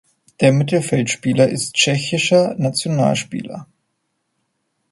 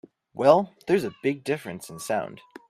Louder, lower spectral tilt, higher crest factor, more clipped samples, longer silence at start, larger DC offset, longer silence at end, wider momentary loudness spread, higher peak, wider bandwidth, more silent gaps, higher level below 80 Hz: first, -17 LUFS vs -25 LUFS; about the same, -4.5 dB/octave vs -5.5 dB/octave; about the same, 18 dB vs 22 dB; neither; about the same, 0.4 s vs 0.35 s; neither; first, 1.25 s vs 0.35 s; second, 11 LU vs 18 LU; first, 0 dBFS vs -4 dBFS; second, 11.5 kHz vs 15 kHz; neither; first, -58 dBFS vs -68 dBFS